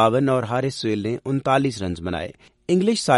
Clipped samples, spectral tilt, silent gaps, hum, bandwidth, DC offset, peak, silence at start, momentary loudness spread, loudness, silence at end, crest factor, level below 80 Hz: under 0.1%; -5.5 dB/octave; none; none; 11.5 kHz; under 0.1%; -2 dBFS; 0 s; 9 LU; -22 LUFS; 0 s; 18 dB; -52 dBFS